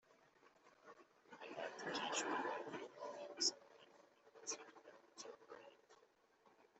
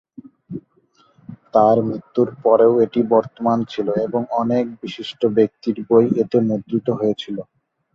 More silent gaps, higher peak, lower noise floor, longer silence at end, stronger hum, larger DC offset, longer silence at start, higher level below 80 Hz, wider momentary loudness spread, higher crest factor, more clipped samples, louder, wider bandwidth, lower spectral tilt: neither; second, -26 dBFS vs -2 dBFS; first, -74 dBFS vs -58 dBFS; second, 0.15 s vs 0.55 s; neither; neither; second, 0.1 s vs 0.5 s; second, under -90 dBFS vs -60 dBFS; first, 25 LU vs 15 LU; first, 24 dB vs 18 dB; neither; second, -46 LUFS vs -18 LUFS; first, 8.2 kHz vs 7 kHz; second, -1 dB/octave vs -8.5 dB/octave